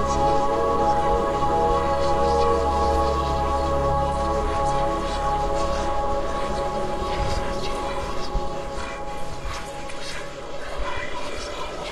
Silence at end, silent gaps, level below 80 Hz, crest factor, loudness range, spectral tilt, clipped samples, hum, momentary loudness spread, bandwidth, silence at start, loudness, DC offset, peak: 0 s; none; -32 dBFS; 16 dB; 10 LU; -5.5 dB/octave; under 0.1%; none; 11 LU; 12.5 kHz; 0 s; -24 LUFS; under 0.1%; -8 dBFS